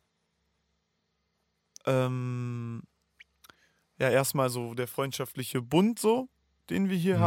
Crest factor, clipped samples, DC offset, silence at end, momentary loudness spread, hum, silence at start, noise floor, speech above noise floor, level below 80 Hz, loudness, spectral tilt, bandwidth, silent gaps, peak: 20 dB; under 0.1%; under 0.1%; 0 s; 11 LU; none; 1.85 s; -78 dBFS; 50 dB; -70 dBFS; -29 LUFS; -5.5 dB/octave; 17 kHz; none; -10 dBFS